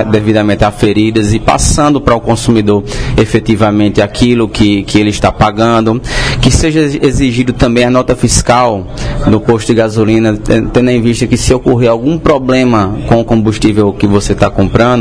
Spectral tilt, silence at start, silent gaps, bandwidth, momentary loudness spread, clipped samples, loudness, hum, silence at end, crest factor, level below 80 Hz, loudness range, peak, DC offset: -5.5 dB/octave; 0 s; none; 11 kHz; 3 LU; 1%; -10 LUFS; none; 0 s; 8 dB; -22 dBFS; 0 LU; 0 dBFS; 0.8%